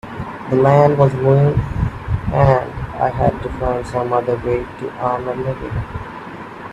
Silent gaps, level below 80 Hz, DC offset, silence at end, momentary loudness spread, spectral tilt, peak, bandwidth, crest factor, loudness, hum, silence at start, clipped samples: none; -32 dBFS; under 0.1%; 0 s; 15 LU; -9 dB/octave; 0 dBFS; 8.4 kHz; 16 dB; -17 LUFS; none; 0.05 s; under 0.1%